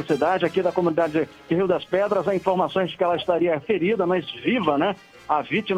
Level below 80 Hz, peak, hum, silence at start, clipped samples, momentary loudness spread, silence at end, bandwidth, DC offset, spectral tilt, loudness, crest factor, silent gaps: -60 dBFS; -6 dBFS; none; 0 s; under 0.1%; 4 LU; 0 s; 11 kHz; under 0.1%; -7 dB/octave; -23 LUFS; 16 dB; none